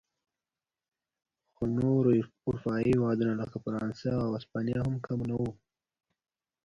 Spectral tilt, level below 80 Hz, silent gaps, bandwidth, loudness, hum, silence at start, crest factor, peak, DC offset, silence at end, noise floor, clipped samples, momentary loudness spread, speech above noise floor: -9 dB/octave; -58 dBFS; none; 7.8 kHz; -31 LUFS; none; 1.6 s; 18 dB; -14 dBFS; under 0.1%; 1.1 s; under -90 dBFS; under 0.1%; 9 LU; over 60 dB